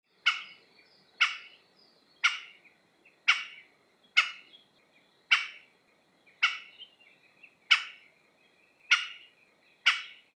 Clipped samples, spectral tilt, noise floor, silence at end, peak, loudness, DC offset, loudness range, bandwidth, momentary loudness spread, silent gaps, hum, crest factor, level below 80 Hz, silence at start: under 0.1%; 3.5 dB/octave; -67 dBFS; 0.25 s; -8 dBFS; -28 LUFS; under 0.1%; 2 LU; 11 kHz; 23 LU; none; none; 26 dB; under -90 dBFS; 0.25 s